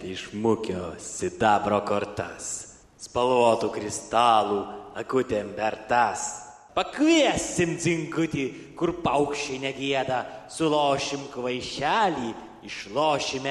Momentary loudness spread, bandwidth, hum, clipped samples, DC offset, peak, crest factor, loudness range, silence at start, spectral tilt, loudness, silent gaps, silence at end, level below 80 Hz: 12 LU; 12.5 kHz; none; under 0.1%; under 0.1%; -6 dBFS; 20 dB; 2 LU; 0 s; -4 dB/octave; -26 LUFS; none; 0 s; -56 dBFS